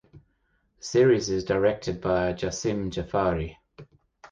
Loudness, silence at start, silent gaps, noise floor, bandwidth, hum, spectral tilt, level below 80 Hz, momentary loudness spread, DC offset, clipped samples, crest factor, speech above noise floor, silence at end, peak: -25 LUFS; 0.15 s; none; -70 dBFS; 9.2 kHz; none; -5.5 dB/octave; -46 dBFS; 10 LU; under 0.1%; under 0.1%; 16 dB; 45 dB; 0.05 s; -10 dBFS